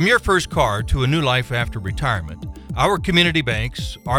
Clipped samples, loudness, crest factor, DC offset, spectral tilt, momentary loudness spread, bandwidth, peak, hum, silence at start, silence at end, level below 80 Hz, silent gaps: under 0.1%; -19 LUFS; 18 dB; under 0.1%; -5 dB/octave; 12 LU; 16.5 kHz; -2 dBFS; none; 0 s; 0 s; -30 dBFS; none